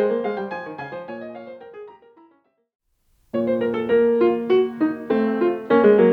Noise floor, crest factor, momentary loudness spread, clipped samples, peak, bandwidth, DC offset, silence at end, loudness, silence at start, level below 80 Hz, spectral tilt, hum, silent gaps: -63 dBFS; 18 dB; 20 LU; under 0.1%; -2 dBFS; 4.9 kHz; under 0.1%; 0 s; -20 LUFS; 0 s; -62 dBFS; -9 dB/octave; none; 2.75-2.79 s